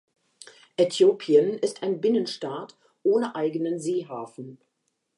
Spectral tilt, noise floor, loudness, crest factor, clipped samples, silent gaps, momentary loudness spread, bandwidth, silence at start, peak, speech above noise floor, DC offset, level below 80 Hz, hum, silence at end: -5.5 dB/octave; -51 dBFS; -24 LUFS; 18 dB; under 0.1%; none; 17 LU; 11.5 kHz; 0.8 s; -8 dBFS; 27 dB; under 0.1%; -84 dBFS; none; 0.6 s